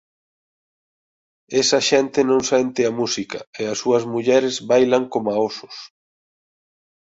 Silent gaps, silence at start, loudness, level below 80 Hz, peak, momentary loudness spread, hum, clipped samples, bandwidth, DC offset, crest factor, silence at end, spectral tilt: 3.47-3.53 s; 1.5 s; -19 LUFS; -62 dBFS; -2 dBFS; 10 LU; none; under 0.1%; 8 kHz; under 0.1%; 18 dB; 1.15 s; -3.5 dB/octave